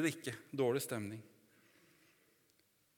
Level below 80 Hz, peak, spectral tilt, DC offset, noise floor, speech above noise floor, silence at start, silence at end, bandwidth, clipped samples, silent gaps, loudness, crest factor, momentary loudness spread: -88 dBFS; -20 dBFS; -5 dB/octave; under 0.1%; -75 dBFS; 36 dB; 0 s; 1.7 s; 19 kHz; under 0.1%; none; -39 LUFS; 22 dB; 12 LU